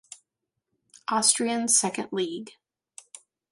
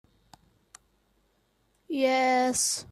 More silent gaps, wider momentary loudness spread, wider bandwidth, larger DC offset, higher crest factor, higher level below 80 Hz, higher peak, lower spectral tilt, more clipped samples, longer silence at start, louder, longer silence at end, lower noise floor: neither; first, 24 LU vs 6 LU; second, 11.5 kHz vs 15 kHz; neither; first, 24 dB vs 16 dB; second, -76 dBFS vs -68 dBFS; first, -6 dBFS vs -14 dBFS; about the same, -1.5 dB/octave vs -1.5 dB/octave; neither; second, 0.1 s vs 1.9 s; about the same, -24 LUFS vs -25 LUFS; first, 1 s vs 0.1 s; first, -83 dBFS vs -70 dBFS